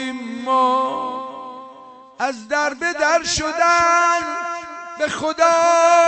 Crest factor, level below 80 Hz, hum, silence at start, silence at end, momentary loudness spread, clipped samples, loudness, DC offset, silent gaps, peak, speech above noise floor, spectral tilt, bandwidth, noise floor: 16 dB; -50 dBFS; none; 0 s; 0 s; 16 LU; under 0.1%; -18 LUFS; under 0.1%; none; -4 dBFS; 25 dB; -2 dB/octave; 8.6 kHz; -42 dBFS